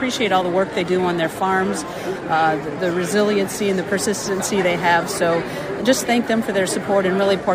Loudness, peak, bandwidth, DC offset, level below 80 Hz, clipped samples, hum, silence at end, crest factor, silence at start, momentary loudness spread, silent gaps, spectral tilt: -19 LUFS; -4 dBFS; 16 kHz; under 0.1%; -52 dBFS; under 0.1%; none; 0 s; 16 dB; 0 s; 5 LU; none; -4 dB/octave